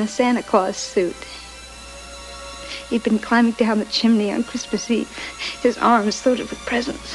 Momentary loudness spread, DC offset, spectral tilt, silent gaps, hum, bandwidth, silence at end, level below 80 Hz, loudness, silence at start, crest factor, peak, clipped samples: 18 LU; under 0.1%; -4 dB/octave; none; 60 Hz at -50 dBFS; 12 kHz; 0 s; -48 dBFS; -20 LUFS; 0 s; 18 dB; -2 dBFS; under 0.1%